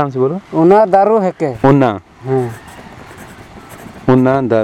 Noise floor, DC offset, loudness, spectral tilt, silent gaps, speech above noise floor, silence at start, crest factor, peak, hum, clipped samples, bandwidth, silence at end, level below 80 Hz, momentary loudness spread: -35 dBFS; under 0.1%; -13 LUFS; -8.5 dB/octave; none; 23 dB; 0 s; 14 dB; 0 dBFS; none; 0.1%; 13 kHz; 0 s; -46 dBFS; 24 LU